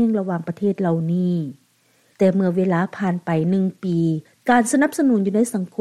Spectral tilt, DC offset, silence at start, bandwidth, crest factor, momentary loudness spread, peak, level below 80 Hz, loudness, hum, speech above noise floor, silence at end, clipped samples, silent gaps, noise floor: -7 dB/octave; under 0.1%; 0 s; 13.5 kHz; 16 dB; 6 LU; -4 dBFS; -66 dBFS; -20 LUFS; none; 41 dB; 0.15 s; under 0.1%; none; -60 dBFS